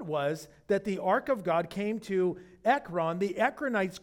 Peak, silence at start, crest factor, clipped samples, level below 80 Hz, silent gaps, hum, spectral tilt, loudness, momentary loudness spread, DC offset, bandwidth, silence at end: -12 dBFS; 0 s; 18 dB; under 0.1%; -66 dBFS; none; none; -6 dB/octave; -30 LUFS; 5 LU; under 0.1%; 17 kHz; 0.05 s